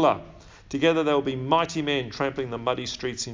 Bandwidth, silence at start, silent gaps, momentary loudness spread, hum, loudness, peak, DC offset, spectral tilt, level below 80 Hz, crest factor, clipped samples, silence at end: 7.6 kHz; 0 s; none; 8 LU; none; -26 LUFS; -6 dBFS; under 0.1%; -4.5 dB/octave; -54 dBFS; 18 dB; under 0.1%; 0 s